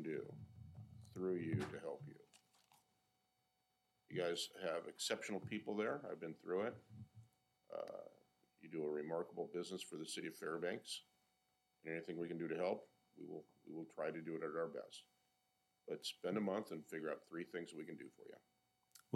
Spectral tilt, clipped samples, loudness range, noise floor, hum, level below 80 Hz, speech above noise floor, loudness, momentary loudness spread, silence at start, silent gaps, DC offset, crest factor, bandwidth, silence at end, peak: -4.5 dB/octave; under 0.1%; 4 LU; -85 dBFS; none; -86 dBFS; 39 dB; -46 LUFS; 16 LU; 0 s; none; under 0.1%; 20 dB; 16 kHz; 0 s; -26 dBFS